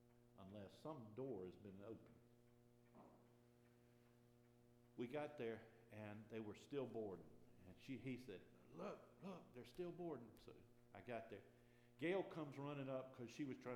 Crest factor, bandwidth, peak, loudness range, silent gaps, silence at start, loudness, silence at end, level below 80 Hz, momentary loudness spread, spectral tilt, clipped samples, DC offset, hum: 22 dB; 14.5 kHz; -34 dBFS; 8 LU; none; 0 s; -54 LUFS; 0 s; -84 dBFS; 15 LU; -7 dB/octave; under 0.1%; under 0.1%; none